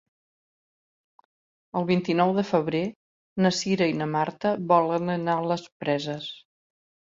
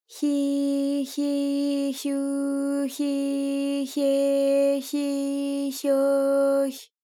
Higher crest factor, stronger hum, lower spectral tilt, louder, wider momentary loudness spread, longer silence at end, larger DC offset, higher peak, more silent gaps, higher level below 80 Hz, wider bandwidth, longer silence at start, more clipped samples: first, 20 dB vs 10 dB; neither; first, -6 dB/octave vs -3 dB/octave; about the same, -25 LUFS vs -25 LUFS; first, 11 LU vs 6 LU; first, 0.7 s vs 0.2 s; neither; first, -6 dBFS vs -14 dBFS; first, 2.96-3.36 s, 5.72-5.80 s vs none; first, -68 dBFS vs under -90 dBFS; second, 7.8 kHz vs 16.5 kHz; first, 1.75 s vs 0.1 s; neither